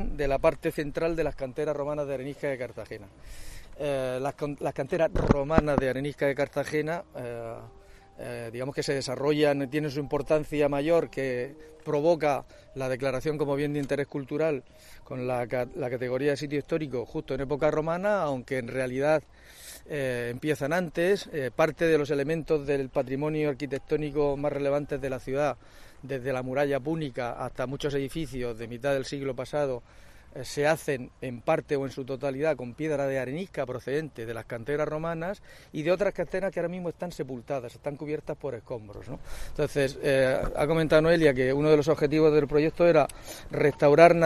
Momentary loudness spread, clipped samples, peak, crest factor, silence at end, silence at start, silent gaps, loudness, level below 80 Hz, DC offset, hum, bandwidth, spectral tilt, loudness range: 14 LU; under 0.1%; -2 dBFS; 26 dB; 0 s; 0 s; none; -28 LUFS; -46 dBFS; under 0.1%; none; 13.5 kHz; -6.5 dB/octave; 7 LU